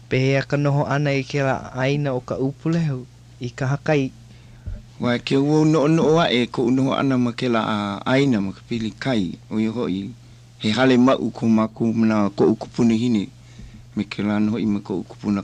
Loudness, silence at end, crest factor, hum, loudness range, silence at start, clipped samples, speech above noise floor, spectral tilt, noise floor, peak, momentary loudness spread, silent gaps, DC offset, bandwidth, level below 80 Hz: -21 LUFS; 0 s; 16 dB; none; 4 LU; 0.1 s; under 0.1%; 21 dB; -7 dB/octave; -41 dBFS; -6 dBFS; 11 LU; none; under 0.1%; 9.6 kHz; -48 dBFS